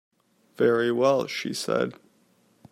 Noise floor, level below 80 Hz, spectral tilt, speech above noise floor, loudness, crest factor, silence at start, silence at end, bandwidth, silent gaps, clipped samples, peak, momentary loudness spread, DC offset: -64 dBFS; -72 dBFS; -5 dB/octave; 40 dB; -25 LUFS; 18 dB; 0.6 s; 0.8 s; 15.5 kHz; none; under 0.1%; -8 dBFS; 8 LU; under 0.1%